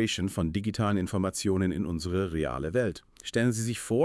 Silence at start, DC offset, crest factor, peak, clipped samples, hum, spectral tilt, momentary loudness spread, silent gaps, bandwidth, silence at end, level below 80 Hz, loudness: 0 s; under 0.1%; 14 dB; -14 dBFS; under 0.1%; none; -5.5 dB/octave; 4 LU; none; 12 kHz; 0 s; -50 dBFS; -29 LUFS